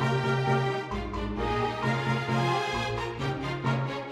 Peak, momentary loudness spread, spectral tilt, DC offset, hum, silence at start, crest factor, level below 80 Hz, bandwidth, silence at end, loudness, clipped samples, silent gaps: -14 dBFS; 5 LU; -6 dB/octave; under 0.1%; none; 0 s; 14 dB; -44 dBFS; 11.5 kHz; 0 s; -29 LUFS; under 0.1%; none